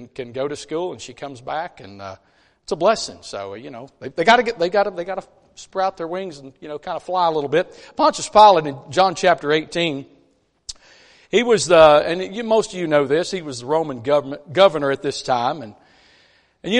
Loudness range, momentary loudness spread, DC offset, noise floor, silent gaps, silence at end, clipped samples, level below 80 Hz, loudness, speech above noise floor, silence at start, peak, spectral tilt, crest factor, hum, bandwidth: 7 LU; 21 LU; under 0.1%; -61 dBFS; none; 0 s; under 0.1%; -54 dBFS; -19 LUFS; 41 dB; 0 s; 0 dBFS; -4 dB/octave; 20 dB; none; 10.5 kHz